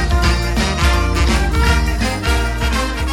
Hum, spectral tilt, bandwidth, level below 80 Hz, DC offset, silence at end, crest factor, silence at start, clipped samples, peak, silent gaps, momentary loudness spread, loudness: none; -5 dB/octave; 16.5 kHz; -18 dBFS; under 0.1%; 0 s; 14 dB; 0 s; under 0.1%; -2 dBFS; none; 3 LU; -16 LUFS